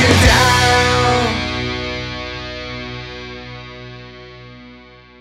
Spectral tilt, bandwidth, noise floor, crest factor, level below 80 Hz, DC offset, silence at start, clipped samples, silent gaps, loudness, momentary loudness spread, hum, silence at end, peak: -4 dB/octave; 16 kHz; -42 dBFS; 18 dB; -30 dBFS; under 0.1%; 0 s; under 0.1%; none; -15 LUFS; 25 LU; 60 Hz at -45 dBFS; 0.4 s; 0 dBFS